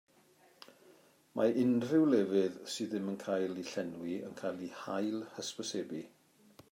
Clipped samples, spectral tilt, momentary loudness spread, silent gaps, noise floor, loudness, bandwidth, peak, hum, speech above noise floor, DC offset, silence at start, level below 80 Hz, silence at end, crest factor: under 0.1%; -5.5 dB/octave; 13 LU; none; -66 dBFS; -35 LUFS; 16 kHz; -18 dBFS; none; 32 dB; under 0.1%; 0.9 s; -84 dBFS; 0.65 s; 18 dB